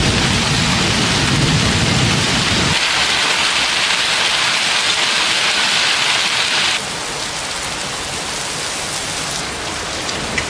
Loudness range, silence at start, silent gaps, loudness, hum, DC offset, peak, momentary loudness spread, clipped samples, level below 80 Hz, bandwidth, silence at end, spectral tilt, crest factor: 7 LU; 0 s; none; -15 LUFS; none; under 0.1%; 0 dBFS; 8 LU; under 0.1%; -36 dBFS; 11 kHz; 0 s; -2.5 dB/octave; 16 dB